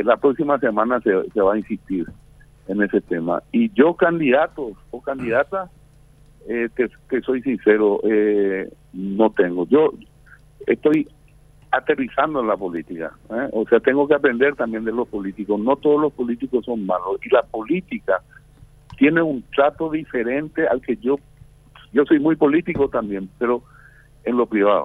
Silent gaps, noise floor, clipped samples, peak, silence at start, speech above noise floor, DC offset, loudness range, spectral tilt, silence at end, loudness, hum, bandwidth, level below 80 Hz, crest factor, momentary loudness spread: none; -50 dBFS; under 0.1%; 0 dBFS; 0 s; 30 dB; under 0.1%; 3 LU; -8.5 dB/octave; 0 s; -20 LUFS; none; 11 kHz; -52 dBFS; 20 dB; 11 LU